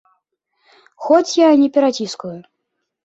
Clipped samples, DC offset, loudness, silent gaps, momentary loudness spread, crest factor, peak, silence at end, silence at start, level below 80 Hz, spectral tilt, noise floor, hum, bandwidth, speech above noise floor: under 0.1%; under 0.1%; -15 LUFS; none; 19 LU; 16 dB; -2 dBFS; 0.65 s; 1 s; -68 dBFS; -4.5 dB/octave; -75 dBFS; none; 8 kHz; 60 dB